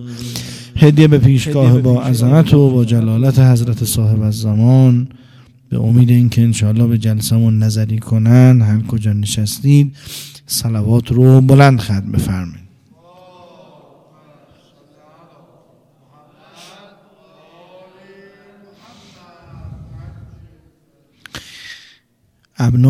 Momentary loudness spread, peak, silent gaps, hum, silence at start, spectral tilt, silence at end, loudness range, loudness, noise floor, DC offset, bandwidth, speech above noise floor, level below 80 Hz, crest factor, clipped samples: 20 LU; 0 dBFS; none; none; 0 s; -7 dB/octave; 0 s; 3 LU; -12 LUFS; -59 dBFS; under 0.1%; 15 kHz; 48 dB; -38 dBFS; 14 dB; 0.1%